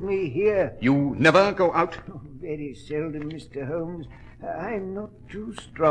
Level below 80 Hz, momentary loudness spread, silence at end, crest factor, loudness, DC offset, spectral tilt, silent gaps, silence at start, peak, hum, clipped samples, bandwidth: -50 dBFS; 19 LU; 0 s; 22 dB; -24 LUFS; under 0.1%; -6.5 dB/octave; none; 0 s; -4 dBFS; none; under 0.1%; 10 kHz